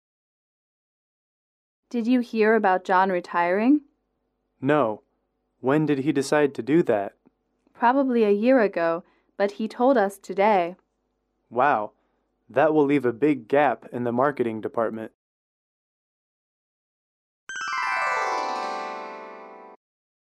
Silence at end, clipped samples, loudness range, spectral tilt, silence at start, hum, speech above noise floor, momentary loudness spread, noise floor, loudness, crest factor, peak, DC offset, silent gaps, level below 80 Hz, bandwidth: 0.6 s; under 0.1%; 7 LU; -6.5 dB/octave; 1.95 s; none; 53 dB; 12 LU; -75 dBFS; -23 LUFS; 18 dB; -8 dBFS; under 0.1%; 15.14-17.47 s; -74 dBFS; 13 kHz